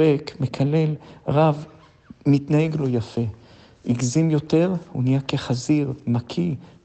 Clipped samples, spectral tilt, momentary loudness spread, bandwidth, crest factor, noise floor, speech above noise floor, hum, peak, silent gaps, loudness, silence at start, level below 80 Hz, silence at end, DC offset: under 0.1%; -7 dB/octave; 9 LU; 8.6 kHz; 16 dB; -48 dBFS; 26 dB; none; -6 dBFS; none; -22 LUFS; 0 s; -56 dBFS; 0.2 s; under 0.1%